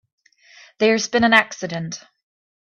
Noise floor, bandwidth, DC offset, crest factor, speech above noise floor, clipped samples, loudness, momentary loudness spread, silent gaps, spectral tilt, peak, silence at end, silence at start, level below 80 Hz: -50 dBFS; 11 kHz; under 0.1%; 22 dB; 31 dB; under 0.1%; -18 LUFS; 16 LU; none; -3.5 dB/octave; 0 dBFS; 0.7 s; 0.8 s; -62 dBFS